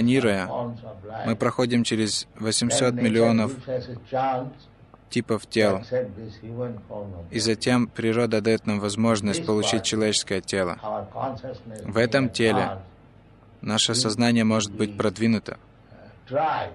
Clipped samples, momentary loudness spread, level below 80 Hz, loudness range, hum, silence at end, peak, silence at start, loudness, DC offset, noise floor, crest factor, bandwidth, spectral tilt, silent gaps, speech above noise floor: under 0.1%; 14 LU; -56 dBFS; 4 LU; none; 0 s; -6 dBFS; 0 s; -24 LUFS; under 0.1%; -51 dBFS; 18 dB; 12 kHz; -4.5 dB/octave; none; 27 dB